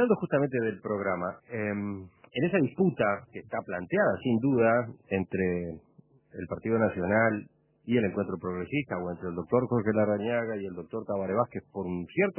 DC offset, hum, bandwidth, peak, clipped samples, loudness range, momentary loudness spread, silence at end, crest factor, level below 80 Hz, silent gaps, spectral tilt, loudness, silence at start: under 0.1%; none; 3.2 kHz; -12 dBFS; under 0.1%; 2 LU; 11 LU; 0.05 s; 18 dB; -58 dBFS; none; -11 dB/octave; -29 LUFS; 0 s